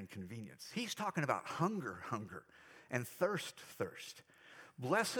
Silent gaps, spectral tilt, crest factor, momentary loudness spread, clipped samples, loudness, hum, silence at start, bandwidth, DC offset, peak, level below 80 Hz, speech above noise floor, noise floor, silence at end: none; -4.5 dB/octave; 24 dB; 20 LU; under 0.1%; -41 LUFS; none; 0 s; over 20 kHz; under 0.1%; -18 dBFS; -84 dBFS; 19 dB; -60 dBFS; 0 s